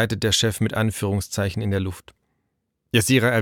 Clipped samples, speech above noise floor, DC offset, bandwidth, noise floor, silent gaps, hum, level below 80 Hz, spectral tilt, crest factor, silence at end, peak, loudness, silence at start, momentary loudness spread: under 0.1%; 54 dB; under 0.1%; 17.5 kHz; -75 dBFS; none; none; -48 dBFS; -4.5 dB/octave; 18 dB; 0 s; -4 dBFS; -22 LUFS; 0 s; 8 LU